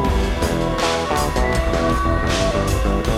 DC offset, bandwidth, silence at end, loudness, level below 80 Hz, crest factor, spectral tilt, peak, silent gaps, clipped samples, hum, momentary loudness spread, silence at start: under 0.1%; 16 kHz; 0 s; -19 LUFS; -24 dBFS; 14 dB; -5 dB/octave; -4 dBFS; none; under 0.1%; none; 1 LU; 0 s